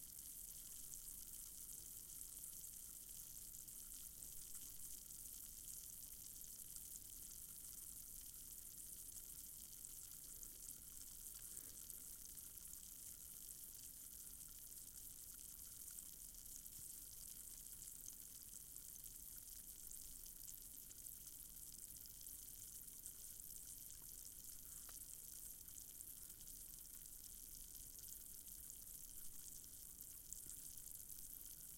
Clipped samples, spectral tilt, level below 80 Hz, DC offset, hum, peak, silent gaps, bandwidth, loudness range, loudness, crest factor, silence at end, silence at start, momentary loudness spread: under 0.1%; -0.5 dB/octave; -70 dBFS; under 0.1%; none; -30 dBFS; none; 17 kHz; 1 LU; -53 LUFS; 26 dB; 0 s; 0 s; 2 LU